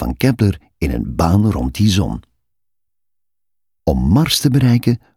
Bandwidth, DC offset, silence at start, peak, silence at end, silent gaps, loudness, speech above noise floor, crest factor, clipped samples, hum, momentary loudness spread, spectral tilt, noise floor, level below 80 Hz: 16.5 kHz; under 0.1%; 0 s; 0 dBFS; 0.2 s; none; -16 LUFS; 68 dB; 16 dB; under 0.1%; none; 9 LU; -6 dB/octave; -83 dBFS; -30 dBFS